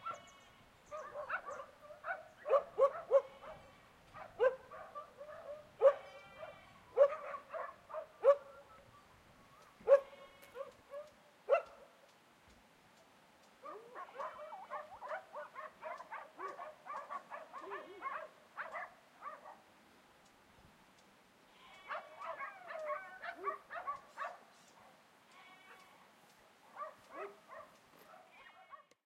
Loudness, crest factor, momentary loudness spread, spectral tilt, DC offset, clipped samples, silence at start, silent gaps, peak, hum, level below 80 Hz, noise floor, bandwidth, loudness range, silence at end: -39 LUFS; 26 dB; 27 LU; -4 dB/octave; under 0.1%; under 0.1%; 0 s; none; -16 dBFS; none; -80 dBFS; -66 dBFS; 11.5 kHz; 16 LU; 0.25 s